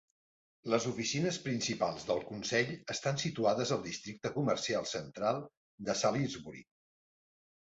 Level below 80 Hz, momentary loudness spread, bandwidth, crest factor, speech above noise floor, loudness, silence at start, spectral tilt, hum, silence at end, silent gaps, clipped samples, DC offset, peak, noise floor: -70 dBFS; 10 LU; 8 kHz; 20 dB; over 56 dB; -34 LUFS; 0.65 s; -4 dB/octave; none; 1.15 s; 5.57-5.78 s; under 0.1%; under 0.1%; -16 dBFS; under -90 dBFS